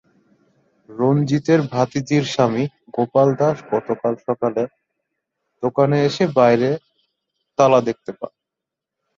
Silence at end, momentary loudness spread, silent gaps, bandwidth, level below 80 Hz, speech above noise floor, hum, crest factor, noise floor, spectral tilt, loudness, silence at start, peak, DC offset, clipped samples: 0.9 s; 13 LU; none; 7.6 kHz; -62 dBFS; 66 dB; none; 18 dB; -84 dBFS; -7 dB/octave; -19 LUFS; 0.9 s; -2 dBFS; under 0.1%; under 0.1%